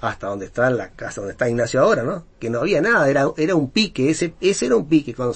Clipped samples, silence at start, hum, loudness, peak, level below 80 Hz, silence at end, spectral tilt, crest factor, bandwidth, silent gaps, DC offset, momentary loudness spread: under 0.1%; 0 s; none; -20 LUFS; -4 dBFS; -46 dBFS; 0 s; -5 dB/octave; 16 dB; 8.8 kHz; none; under 0.1%; 11 LU